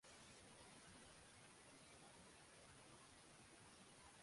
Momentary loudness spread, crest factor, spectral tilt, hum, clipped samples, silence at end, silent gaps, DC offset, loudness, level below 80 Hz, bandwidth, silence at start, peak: 2 LU; 16 dB; -2.5 dB/octave; none; under 0.1%; 0 s; none; under 0.1%; -64 LUFS; -80 dBFS; 11.5 kHz; 0 s; -50 dBFS